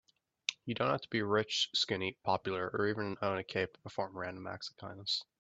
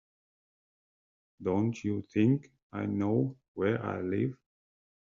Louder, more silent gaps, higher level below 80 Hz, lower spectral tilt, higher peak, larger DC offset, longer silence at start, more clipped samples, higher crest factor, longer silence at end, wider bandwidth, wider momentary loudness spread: second, -36 LUFS vs -32 LUFS; second, none vs 2.63-2.70 s, 3.48-3.55 s; about the same, -74 dBFS vs -70 dBFS; second, -4 dB/octave vs -8.5 dB/octave; about the same, -12 dBFS vs -14 dBFS; neither; second, 0.5 s vs 1.4 s; neither; first, 26 dB vs 18 dB; second, 0.15 s vs 0.65 s; first, 8.2 kHz vs 7.4 kHz; about the same, 10 LU vs 8 LU